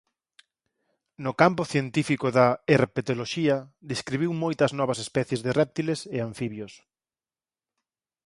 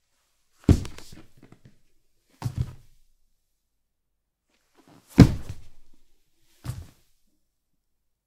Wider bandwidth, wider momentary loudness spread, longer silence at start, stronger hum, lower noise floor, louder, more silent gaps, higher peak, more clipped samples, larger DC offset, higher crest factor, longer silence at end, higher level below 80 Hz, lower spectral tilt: second, 11.5 kHz vs 15 kHz; second, 12 LU vs 26 LU; first, 1.2 s vs 0.7 s; neither; first, under -90 dBFS vs -77 dBFS; second, -26 LUFS vs -23 LUFS; neither; about the same, -2 dBFS vs 0 dBFS; neither; neither; about the same, 24 dB vs 28 dB; about the same, 1.55 s vs 1.45 s; second, -62 dBFS vs -40 dBFS; second, -6 dB/octave vs -7.5 dB/octave